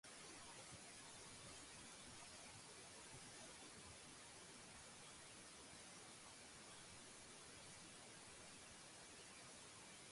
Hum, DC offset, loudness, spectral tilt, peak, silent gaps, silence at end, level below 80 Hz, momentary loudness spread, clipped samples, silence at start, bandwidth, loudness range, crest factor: none; under 0.1%; -58 LUFS; -2 dB/octave; -44 dBFS; none; 0 s; -80 dBFS; 2 LU; under 0.1%; 0.05 s; 11.5 kHz; 1 LU; 16 dB